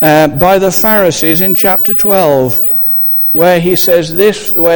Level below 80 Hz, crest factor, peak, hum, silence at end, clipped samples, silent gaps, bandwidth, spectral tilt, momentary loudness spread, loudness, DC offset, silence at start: -38 dBFS; 8 dB; 0 dBFS; none; 0 s; 0.6%; none; over 20 kHz; -5 dB/octave; 2 LU; -7 LUFS; 2%; 0 s